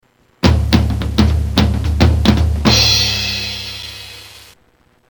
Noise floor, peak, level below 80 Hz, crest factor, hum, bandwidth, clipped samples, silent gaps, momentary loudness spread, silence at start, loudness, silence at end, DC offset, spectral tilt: -54 dBFS; 0 dBFS; -20 dBFS; 16 dB; none; 19 kHz; under 0.1%; none; 16 LU; 0.45 s; -14 LUFS; 0.75 s; under 0.1%; -4.5 dB/octave